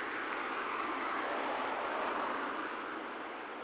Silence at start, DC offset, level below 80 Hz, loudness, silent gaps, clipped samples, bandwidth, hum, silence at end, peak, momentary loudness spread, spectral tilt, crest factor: 0 s; under 0.1%; -74 dBFS; -37 LUFS; none; under 0.1%; 4 kHz; none; 0 s; -24 dBFS; 6 LU; -0.5 dB/octave; 14 dB